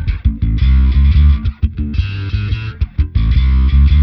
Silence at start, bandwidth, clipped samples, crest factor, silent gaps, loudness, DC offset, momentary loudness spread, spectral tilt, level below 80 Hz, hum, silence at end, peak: 0 s; 5.4 kHz; under 0.1%; 10 dB; none; -15 LUFS; under 0.1%; 9 LU; -9 dB/octave; -12 dBFS; none; 0 s; -2 dBFS